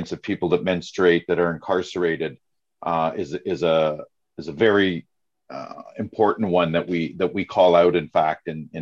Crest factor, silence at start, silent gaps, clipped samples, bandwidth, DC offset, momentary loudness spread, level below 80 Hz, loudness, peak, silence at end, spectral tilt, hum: 18 dB; 0 s; none; under 0.1%; 7.6 kHz; under 0.1%; 17 LU; -54 dBFS; -21 LUFS; -4 dBFS; 0 s; -6.5 dB/octave; none